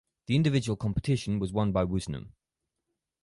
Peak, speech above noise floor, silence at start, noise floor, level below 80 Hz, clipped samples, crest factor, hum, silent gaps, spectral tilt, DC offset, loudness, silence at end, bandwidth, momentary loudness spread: -14 dBFS; 57 dB; 0.3 s; -85 dBFS; -48 dBFS; under 0.1%; 16 dB; none; none; -7 dB/octave; under 0.1%; -29 LUFS; 0.95 s; 11.5 kHz; 8 LU